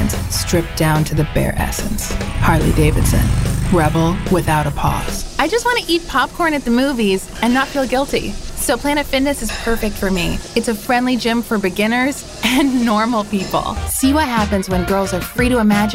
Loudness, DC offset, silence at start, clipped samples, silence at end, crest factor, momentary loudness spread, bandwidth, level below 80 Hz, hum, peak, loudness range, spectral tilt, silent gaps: -17 LUFS; under 0.1%; 0 s; under 0.1%; 0 s; 16 dB; 5 LU; 16 kHz; -26 dBFS; none; 0 dBFS; 2 LU; -5 dB/octave; none